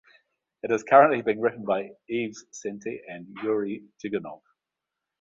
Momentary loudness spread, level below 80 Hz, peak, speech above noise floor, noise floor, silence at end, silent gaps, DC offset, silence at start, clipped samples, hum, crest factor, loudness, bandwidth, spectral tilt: 19 LU; -72 dBFS; -4 dBFS; 61 dB; -86 dBFS; 0.85 s; none; under 0.1%; 0.65 s; under 0.1%; none; 22 dB; -25 LUFS; 7.6 kHz; -5.5 dB/octave